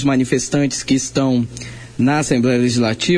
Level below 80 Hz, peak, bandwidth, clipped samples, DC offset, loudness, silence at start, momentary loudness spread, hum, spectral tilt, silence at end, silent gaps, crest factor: -44 dBFS; -4 dBFS; 10.5 kHz; under 0.1%; under 0.1%; -17 LUFS; 0 s; 7 LU; none; -5 dB/octave; 0 s; none; 14 dB